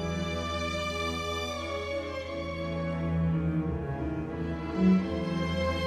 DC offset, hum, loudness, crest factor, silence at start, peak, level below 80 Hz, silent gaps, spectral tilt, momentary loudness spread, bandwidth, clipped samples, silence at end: under 0.1%; none; -31 LUFS; 16 dB; 0 s; -14 dBFS; -44 dBFS; none; -6.5 dB/octave; 8 LU; 13.5 kHz; under 0.1%; 0 s